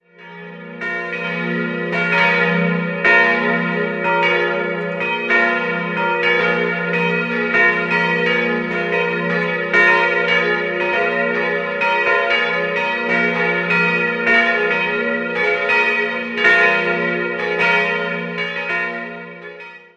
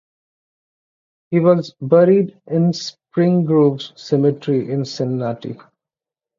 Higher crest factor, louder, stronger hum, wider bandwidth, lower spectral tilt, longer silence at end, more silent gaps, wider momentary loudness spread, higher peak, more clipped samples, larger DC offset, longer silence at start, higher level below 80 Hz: about the same, 16 dB vs 16 dB; about the same, -16 LUFS vs -17 LUFS; neither; first, 8.8 kHz vs 7.6 kHz; second, -5.5 dB/octave vs -7.5 dB/octave; second, 0.2 s vs 0.8 s; neither; second, 9 LU vs 12 LU; about the same, -2 dBFS vs -2 dBFS; neither; neither; second, 0.2 s vs 1.3 s; about the same, -62 dBFS vs -64 dBFS